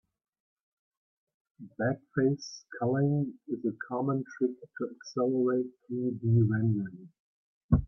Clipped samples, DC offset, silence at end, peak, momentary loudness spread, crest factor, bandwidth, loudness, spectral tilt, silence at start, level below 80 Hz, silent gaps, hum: under 0.1%; under 0.1%; 0 s; -10 dBFS; 11 LU; 20 dB; 6.6 kHz; -31 LUFS; -8 dB/octave; 1.6 s; -52 dBFS; 7.20-7.69 s; none